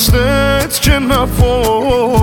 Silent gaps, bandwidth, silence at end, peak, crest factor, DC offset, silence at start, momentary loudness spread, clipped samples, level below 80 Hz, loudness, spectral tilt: none; 19.5 kHz; 0 s; 0 dBFS; 10 dB; under 0.1%; 0 s; 2 LU; under 0.1%; -18 dBFS; -12 LUFS; -5 dB/octave